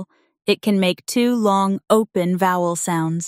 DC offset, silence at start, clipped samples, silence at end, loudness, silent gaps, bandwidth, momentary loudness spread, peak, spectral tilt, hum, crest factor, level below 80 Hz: under 0.1%; 0 s; under 0.1%; 0 s; -19 LUFS; none; 16 kHz; 4 LU; 0 dBFS; -5 dB/octave; none; 18 dB; -66 dBFS